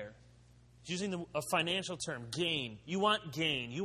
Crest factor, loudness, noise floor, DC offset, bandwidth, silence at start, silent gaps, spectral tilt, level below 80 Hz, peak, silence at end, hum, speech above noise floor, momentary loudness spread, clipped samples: 20 dB; -35 LUFS; -61 dBFS; under 0.1%; 13.5 kHz; 0 s; none; -3.5 dB/octave; -66 dBFS; -16 dBFS; 0 s; none; 26 dB; 9 LU; under 0.1%